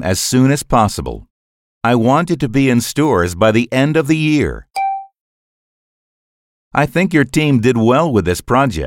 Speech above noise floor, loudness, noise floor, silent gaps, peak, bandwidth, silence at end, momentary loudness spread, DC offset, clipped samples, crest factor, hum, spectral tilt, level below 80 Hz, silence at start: over 76 dB; -14 LUFS; under -90 dBFS; 1.30-1.81 s, 5.20-6.71 s; 0 dBFS; 17 kHz; 0 s; 8 LU; under 0.1%; under 0.1%; 14 dB; none; -5.5 dB/octave; -36 dBFS; 0 s